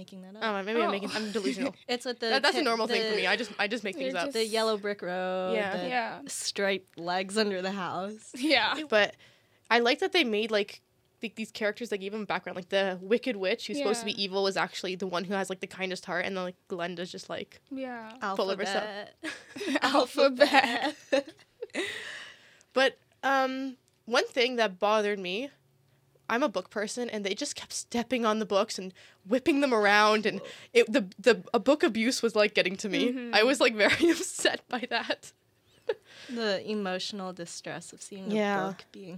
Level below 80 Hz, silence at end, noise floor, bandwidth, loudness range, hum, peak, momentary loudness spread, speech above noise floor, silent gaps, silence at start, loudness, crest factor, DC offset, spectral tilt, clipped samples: -76 dBFS; 0 s; -66 dBFS; 15.5 kHz; 8 LU; none; -4 dBFS; 14 LU; 37 dB; none; 0 s; -29 LUFS; 26 dB; under 0.1%; -3.5 dB/octave; under 0.1%